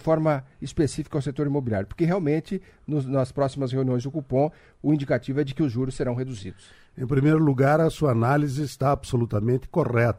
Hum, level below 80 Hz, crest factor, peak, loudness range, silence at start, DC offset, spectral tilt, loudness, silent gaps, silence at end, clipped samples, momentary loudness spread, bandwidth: none; -48 dBFS; 16 dB; -8 dBFS; 4 LU; 0.05 s; under 0.1%; -8 dB/octave; -25 LUFS; none; 0 s; under 0.1%; 9 LU; 13.5 kHz